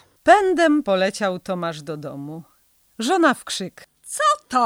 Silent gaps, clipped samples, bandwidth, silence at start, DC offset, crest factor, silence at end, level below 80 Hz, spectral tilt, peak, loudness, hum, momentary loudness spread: none; under 0.1%; 16.5 kHz; 0.25 s; under 0.1%; 20 dB; 0 s; -60 dBFS; -4 dB/octave; -2 dBFS; -20 LUFS; none; 18 LU